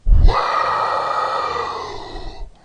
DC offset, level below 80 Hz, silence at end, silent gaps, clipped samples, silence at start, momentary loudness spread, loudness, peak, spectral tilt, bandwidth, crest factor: under 0.1%; -20 dBFS; 0.15 s; none; under 0.1%; 0.05 s; 17 LU; -19 LUFS; 0 dBFS; -5.5 dB/octave; 8.6 kHz; 16 dB